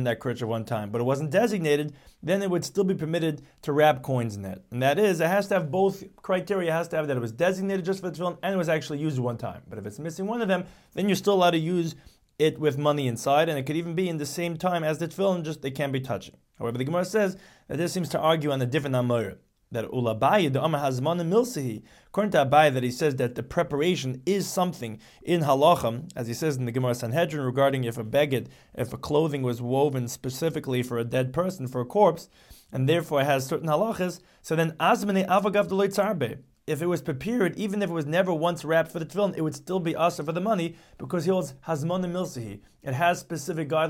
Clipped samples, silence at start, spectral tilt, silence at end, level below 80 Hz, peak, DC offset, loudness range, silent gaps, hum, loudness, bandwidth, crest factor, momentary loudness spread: under 0.1%; 0 s; -6 dB/octave; 0 s; -60 dBFS; -8 dBFS; under 0.1%; 4 LU; none; none; -26 LUFS; 17 kHz; 18 dB; 11 LU